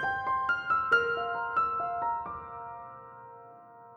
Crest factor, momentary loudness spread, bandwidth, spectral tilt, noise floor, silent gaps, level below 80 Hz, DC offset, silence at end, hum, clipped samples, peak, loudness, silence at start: 20 dB; 22 LU; 7.8 kHz; -4.5 dB/octave; -51 dBFS; none; -64 dBFS; under 0.1%; 0 s; none; under 0.1%; -12 dBFS; -29 LUFS; 0 s